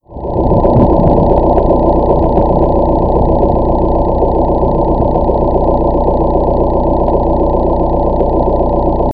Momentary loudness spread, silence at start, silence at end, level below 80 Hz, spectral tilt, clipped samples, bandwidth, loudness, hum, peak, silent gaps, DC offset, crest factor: 3 LU; 0 s; 0 s; -16 dBFS; -12.5 dB/octave; 0.1%; 4.9 kHz; -12 LUFS; 60 Hz at -20 dBFS; 0 dBFS; none; 2%; 10 dB